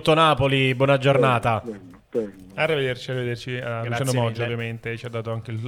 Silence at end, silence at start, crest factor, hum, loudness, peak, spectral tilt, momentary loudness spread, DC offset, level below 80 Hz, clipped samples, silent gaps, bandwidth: 0 s; 0 s; 18 dB; none; -23 LUFS; -4 dBFS; -6 dB/octave; 13 LU; under 0.1%; -52 dBFS; under 0.1%; none; 14.5 kHz